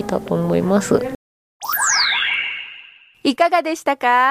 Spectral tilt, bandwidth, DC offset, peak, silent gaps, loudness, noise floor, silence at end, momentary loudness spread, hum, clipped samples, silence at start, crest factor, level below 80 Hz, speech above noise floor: -3.5 dB/octave; 15.5 kHz; under 0.1%; -4 dBFS; 1.15-1.60 s; -18 LUFS; -43 dBFS; 0 s; 15 LU; none; under 0.1%; 0 s; 16 dB; -52 dBFS; 26 dB